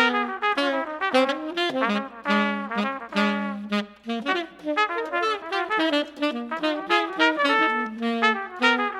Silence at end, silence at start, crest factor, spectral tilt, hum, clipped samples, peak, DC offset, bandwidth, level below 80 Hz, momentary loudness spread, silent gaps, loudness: 0 s; 0 s; 20 dB; -4.5 dB/octave; none; under 0.1%; -4 dBFS; under 0.1%; 13 kHz; -68 dBFS; 7 LU; none; -24 LUFS